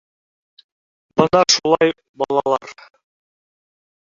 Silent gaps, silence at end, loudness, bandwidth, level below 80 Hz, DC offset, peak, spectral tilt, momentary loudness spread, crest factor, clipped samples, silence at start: 2.09-2.14 s; 1.45 s; -17 LUFS; 7.6 kHz; -58 dBFS; under 0.1%; 0 dBFS; -3.5 dB/octave; 10 LU; 20 dB; under 0.1%; 1.15 s